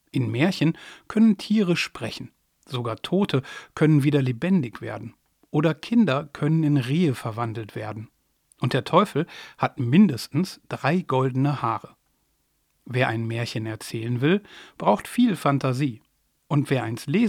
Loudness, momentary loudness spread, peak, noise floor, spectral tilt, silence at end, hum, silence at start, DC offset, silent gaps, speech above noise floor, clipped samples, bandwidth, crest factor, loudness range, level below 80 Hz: -24 LUFS; 13 LU; -4 dBFS; -70 dBFS; -7 dB/octave; 0 s; none; 0.15 s; under 0.1%; none; 47 dB; under 0.1%; 15.5 kHz; 20 dB; 3 LU; -64 dBFS